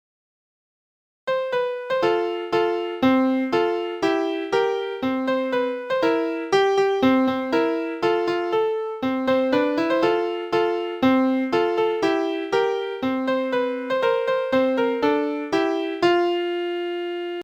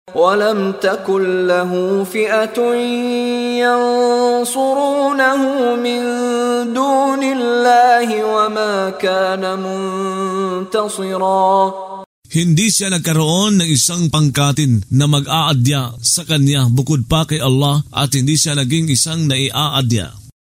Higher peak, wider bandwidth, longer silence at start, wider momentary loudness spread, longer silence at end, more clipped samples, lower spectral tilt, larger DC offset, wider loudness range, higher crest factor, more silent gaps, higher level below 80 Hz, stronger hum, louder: second, -6 dBFS vs 0 dBFS; second, 14.5 kHz vs 16 kHz; first, 1.25 s vs 0.05 s; about the same, 6 LU vs 6 LU; second, 0 s vs 0.15 s; neither; about the same, -5.5 dB/octave vs -4.5 dB/octave; neither; about the same, 1 LU vs 3 LU; about the same, 16 dB vs 14 dB; second, none vs 12.06-12.22 s; second, -62 dBFS vs -46 dBFS; neither; second, -22 LUFS vs -15 LUFS